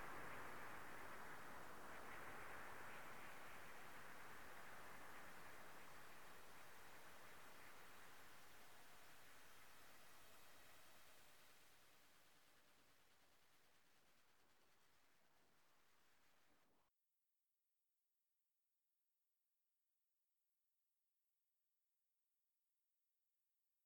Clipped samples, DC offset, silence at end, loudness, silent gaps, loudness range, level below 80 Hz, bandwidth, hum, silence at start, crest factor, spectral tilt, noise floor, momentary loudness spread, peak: under 0.1%; under 0.1%; 0 s; -61 LUFS; none; 10 LU; -84 dBFS; 19 kHz; none; 0 s; 18 dB; -3 dB/octave; under -90 dBFS; 10 LU; -42 dBFS